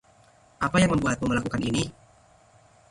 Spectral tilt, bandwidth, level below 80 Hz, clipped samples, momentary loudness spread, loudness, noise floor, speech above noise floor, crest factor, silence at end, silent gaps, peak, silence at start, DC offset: -5.5 dB/octave; 11.5 kHz; -48 dBFS; under 0.1%; 8 LU; -25 LUFS; -58 dBFS; 33 dB; 18 dB; 1 s; none; -8 dBFS; 0.6 s; under 0.1%